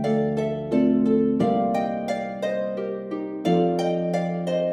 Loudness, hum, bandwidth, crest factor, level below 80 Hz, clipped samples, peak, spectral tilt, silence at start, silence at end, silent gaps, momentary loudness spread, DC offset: -24 LUFS; none; 11.5 kHz; 14 dB; -56 dBFS; under 0.1%; -10 dBFS; -8 dB/octave; 0 s; 0 s; none; 8 LU; under 0.1%